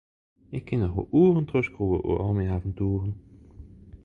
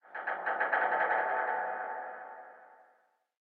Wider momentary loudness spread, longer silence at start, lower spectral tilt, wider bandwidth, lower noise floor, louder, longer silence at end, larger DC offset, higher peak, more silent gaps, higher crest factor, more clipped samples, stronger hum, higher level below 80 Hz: second, 14 LU vs 18 LU; first, 0.5 s vs 0.05 s; first, -10.5 dB/octave vs 0.5 dB/octave; about the same, 4.3 kHz vs 4.7 kHz; second, -47 dBFS vs -70 dBFS; first, -26 LUFS vs -32 LUFS; second, 0.1 s vs 0.75 s; neither; first, -10 dBFS vs -16 dBFS; neither; about the same, 16 dB vs 20 dB; neither; neither; first, -42 dBFS vs under -90 dBFS